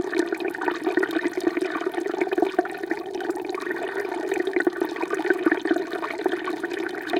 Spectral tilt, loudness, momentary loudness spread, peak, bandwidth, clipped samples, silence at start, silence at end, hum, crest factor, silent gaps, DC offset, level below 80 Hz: -4 dB/octave; -26 LUFS; 6 LU; -6 dBFS; 16.5 kHz; under 0.1%; 0 s; 0 s; none; 20 dB; none; under 0.1%; -70 dBFS